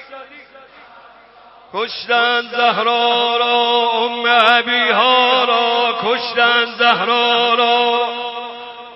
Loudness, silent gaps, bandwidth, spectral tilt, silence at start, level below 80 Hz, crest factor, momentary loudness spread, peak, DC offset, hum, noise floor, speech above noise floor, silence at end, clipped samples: -14 LUFS; none; 6 kHz; -4 dB/octave; 0 s; -68 dBFS; 16 dB; 12 LU; 0 dBFS; under 0.1%; none; -44 dBFS; 30 dB; 0 s; under 0.1%